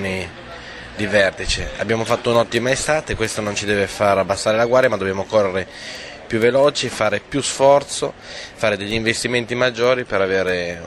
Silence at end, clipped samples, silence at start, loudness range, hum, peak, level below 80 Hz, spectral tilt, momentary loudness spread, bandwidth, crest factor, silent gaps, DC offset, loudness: 0 s; under 0.1%; 0 s; 1 LU; none; -2 dBFS; -40 dBFS; -4 dB/octave; 14 LU; 15.5 kHz; 18 dB; none; under 0.1%; -18 LUFS